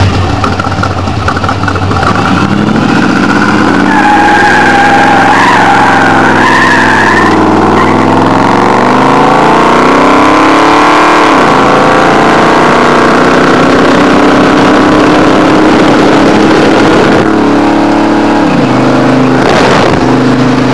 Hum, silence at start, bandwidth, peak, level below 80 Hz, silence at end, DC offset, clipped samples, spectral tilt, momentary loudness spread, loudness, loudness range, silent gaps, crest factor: none; 0 s; 11 kHz; 0 dBFS; -30 dBFS; 0 s; 7%; 4%; -5.5 dB/octave; 4 LU; -5 LUFS; 2 LU; none; 6 dB